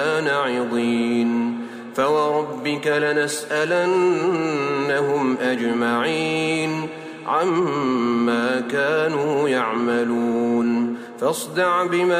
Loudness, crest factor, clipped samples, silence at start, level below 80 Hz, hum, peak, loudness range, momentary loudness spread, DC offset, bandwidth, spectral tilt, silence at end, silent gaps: -21 LUFS; 14 dB; under 0.1%; 0 s; -70 dBFS; none; -8 dBFS; 1 LU; 5 LU; under 0.1%; 16 kHz; -5 dB/octave; 0 s; none